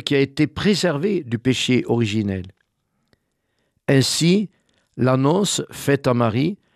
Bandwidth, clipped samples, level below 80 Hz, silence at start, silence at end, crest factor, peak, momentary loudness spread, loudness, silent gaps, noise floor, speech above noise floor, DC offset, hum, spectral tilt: 14.5 kHz; under 0.1%; -54 dBFS; 0.05 s; 0.2 s; 16 dB; -4 dBFS; 6 LU; -20 LUFS; none; -71 dBFS; 52 dB; under 0.1%; none; -5 dB/octave